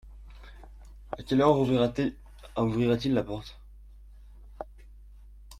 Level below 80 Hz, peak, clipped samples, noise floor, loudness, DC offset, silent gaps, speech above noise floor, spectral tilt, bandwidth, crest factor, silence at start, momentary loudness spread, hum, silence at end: -48 dBFS; -8 dBFS; under 0.1%; -49 dBFS; -27 LUFS; under 0.1%; none; 24 dB; -7.5 dB/octave; 14 kHz; 22 dB; 0.05 s; 27 LU; 50 Hz at -50 dBFS; 0 s